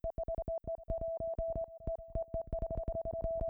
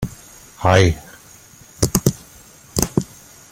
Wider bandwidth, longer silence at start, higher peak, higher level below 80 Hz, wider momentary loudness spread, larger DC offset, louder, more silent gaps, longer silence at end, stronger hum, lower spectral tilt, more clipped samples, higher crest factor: second, 2.3 kHz vs 16.5 kHz; about the same, 0.05 s vs 0 s; second, -24 dBFS vs 0 dBFS; second, -44 dBFS vs -38 dBFS; second, 3 LU vs 25 LU; neither; second, -40 LUFS vs -19 LUFS; neither; second, 0 s vs 0.5 s; neither; first, -12 dB/octave vs -4.5 dB/octave; neither; second, 14 dB vs 20 dB